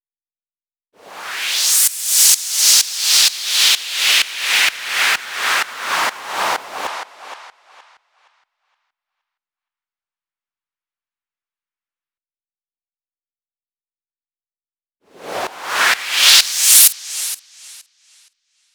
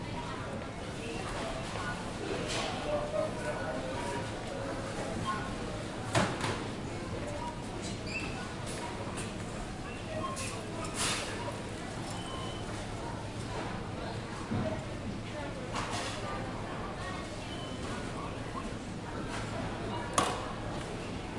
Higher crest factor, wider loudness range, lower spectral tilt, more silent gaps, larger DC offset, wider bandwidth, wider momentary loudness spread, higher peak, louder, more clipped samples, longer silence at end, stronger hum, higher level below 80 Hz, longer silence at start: second, 20 dB vs 28 dB; first, 16 LU vs 3 LU; second, 3.5 dB/octave vs -4.5 dB/octave; neither; neither; first, over 20 kHz vs 11.5 kHz; first, 17 LU vs 7 LU; first, 0 dBFS vs -8 dBFS; first, -13 LUFS vs -37 LUFS; neither; first, 0.95 s vs 0 s; neither; second, -72 dBFS vs -50 dBFS; first, 1.05 s vs 0 s